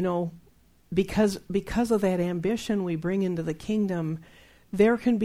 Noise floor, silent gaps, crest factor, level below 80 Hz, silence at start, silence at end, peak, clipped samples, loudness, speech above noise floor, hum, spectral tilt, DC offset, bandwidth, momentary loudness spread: -59 dBFS; none; 18 dB; -50 dBFS; 0 s; 0 s; -8 dBFS; under 0.1%; -27 LUFS; 33 dB; none; -7 dB/octave; under 0.1%; 15.5 kHz; 8 LU